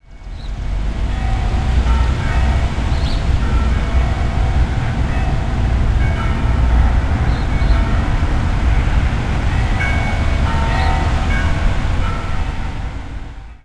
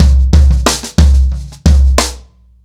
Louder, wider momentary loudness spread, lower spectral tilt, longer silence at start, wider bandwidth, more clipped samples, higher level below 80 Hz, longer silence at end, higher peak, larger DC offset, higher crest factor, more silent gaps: second, -18 LUFS vs -11 LUFS; about the same, 7 LU vs 6 LU; first, -6.5 dB/octave vs -5 dB/octave; about the same, 0.1 s vs 0 s; second, 10 kHz vs 14 kHz; neither; second, -16 dBFS vs -10 dBFS; second, 0.05 s vs 0.45 s; about the same, -2 dBFS vs 0 dBFS; neither; about the same, 14 dB vs 10 dB; neither